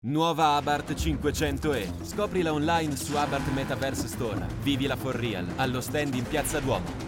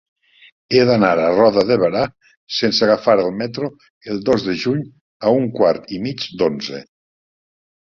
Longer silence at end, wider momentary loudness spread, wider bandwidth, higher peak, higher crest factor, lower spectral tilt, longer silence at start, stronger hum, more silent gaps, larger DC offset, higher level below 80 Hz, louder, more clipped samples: second, 0 s vs 1.1 s; second, 6 LU vs 13 LU; first, 17 kHz vs 7.2 kHz; second, -10 dBFS vs -2 dBFS; about the same, 16 dB vs 16 dB; about the same, -5 dB/octave vs -6 dB/octave; second, 0.05 s vs 0.7 s; neither; second, none vs 2.37-2.47 s, 3.90-4.01 s, 5.01-5.20 s; neither; first, -42 dBFS vs -54 dBFS; second, -28 LUFS vs -17 LUFS; neither